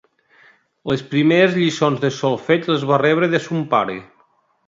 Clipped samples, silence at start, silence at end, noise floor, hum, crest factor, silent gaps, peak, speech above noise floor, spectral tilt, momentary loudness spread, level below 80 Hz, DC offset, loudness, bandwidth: under 0.1%; 0.85 s; 0.65 s; -60 dBFS; none; 18 dB; none; 0 dBFS; 42 dB; -6 dB/octave; 10 LU; -58 dBFS; under 0.1%; -18 LUFS; 7.8 kHz